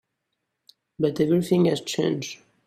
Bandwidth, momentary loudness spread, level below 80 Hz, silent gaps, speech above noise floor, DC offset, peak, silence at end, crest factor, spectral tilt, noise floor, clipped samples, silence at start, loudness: 15 kHz; 8 LU; -64 dBFS; none; 57 dB; under 0.1%; -8 dBFS; 0.3 s; 16 dB; -6 dB/octave; -79 dBFS; under 0.1%; 1 s; -23 LUFS